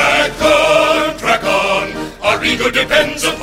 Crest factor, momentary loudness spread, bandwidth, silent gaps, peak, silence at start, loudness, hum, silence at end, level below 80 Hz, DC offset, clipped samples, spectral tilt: 14 dB; 6 LU; 16 kHz; none; 0 dBFS; 0 s; -13 LUFS; none; 0 s; -38 dBFS; under 0.1%; under 0.1%; -2.5 dB/octave